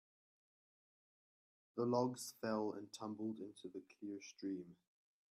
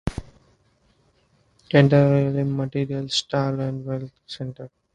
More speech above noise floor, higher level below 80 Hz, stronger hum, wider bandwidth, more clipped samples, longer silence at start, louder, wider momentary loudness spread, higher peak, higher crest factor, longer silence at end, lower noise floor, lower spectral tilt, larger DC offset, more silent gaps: first, over 46 dB vs 41 dB; second, -88 dBFS vs -48 dBFS; neither; first, 14 kHz vs 9.2 kHz; neither; first, 1.75 s vs 0.05 s; second, -45 LUFS vs -22 LUFS; second, 13 LU vs 18 LU; second, -24 dBFS vs -2 dBFS; about the same, 22 dB vs 22 dB; first, 0.55 s vs 0.25 s; first, under -90 dBFS vs -63 dBFS; about the same, -5.5 dB/octave vs -6.5 dB/octave; neither; neither